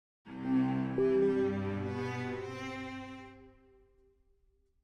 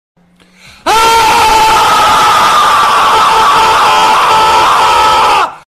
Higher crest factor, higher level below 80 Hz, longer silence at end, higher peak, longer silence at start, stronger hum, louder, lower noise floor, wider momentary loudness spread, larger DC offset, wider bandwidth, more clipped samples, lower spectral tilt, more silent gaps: first, 16 dB vs 8 dB; second, -64 dBFS vs -36 dBFS; first, 1.35 s vs 0.15 s; second, -20 dBFS vs 0 dBFS; second, 0.25 s vs 0.85 s; neither; second, -34 LUFS vs -6 LUFS; first, -71 dBFS vs -43 dBFS; first, 18 LU vs 2 LU; neither; second, 8.2 kHz vs 15 kHz; neither; first, -8 dB/octave vs -1.5 dB/octave; neither